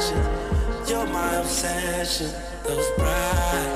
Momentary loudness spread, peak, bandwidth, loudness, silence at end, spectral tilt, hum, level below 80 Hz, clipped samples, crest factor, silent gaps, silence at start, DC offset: 4 LU; -10 dBFS; 16 kHz; -25 LUFS; 0 s; -4 dB/octave; none; -30 dBFS; under 0.1%; 14 dB; none; 0 s; under 0.1%